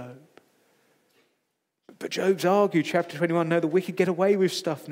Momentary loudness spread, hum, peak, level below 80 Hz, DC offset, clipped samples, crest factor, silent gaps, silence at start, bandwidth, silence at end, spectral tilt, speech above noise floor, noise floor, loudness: 8 LU; none; -8 dBFS; -84 dBFS; under 0.1%; under 0.1%; 18 dB; none; 0 s; 16 kHz; 0 s; -6 dB/octave; 54 dB; -78 dBFS; -24 LUFS